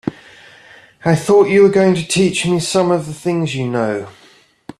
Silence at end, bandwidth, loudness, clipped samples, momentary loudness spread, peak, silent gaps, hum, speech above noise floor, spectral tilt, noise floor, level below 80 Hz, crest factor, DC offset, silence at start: 0.7 s; 13 kHz; -15 LUFS; under 0.1%; 11 LU; -2 dBFS; none; none; 30 dB; -5.5 dB/octave; -44 dBFS; -52 dBFS; 14 dB; under 0.1%; 0.05 s